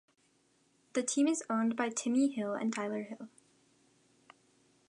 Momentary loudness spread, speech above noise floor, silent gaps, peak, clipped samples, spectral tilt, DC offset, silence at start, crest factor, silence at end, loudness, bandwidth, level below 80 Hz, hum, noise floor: 12 LU; 39 dB; none; -16 dBFS; under 0.1%; -4 dB/octave; under 0.1%; 0.95 s; 20 dB; 1.6 s; -33 LUFS; 11 kHz; -88 dBFS; none; -72 dBFS